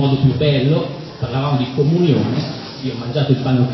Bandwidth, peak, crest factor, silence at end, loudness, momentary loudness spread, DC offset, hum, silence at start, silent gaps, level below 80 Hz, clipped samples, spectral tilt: 6 kHz; -2 dBFS; 14 dB; 0 s; -18 LUFS; 11 LU; under 0.1%; none; 0 s; none; -44 dBFS; under 0.1%; -8.5 dB/octave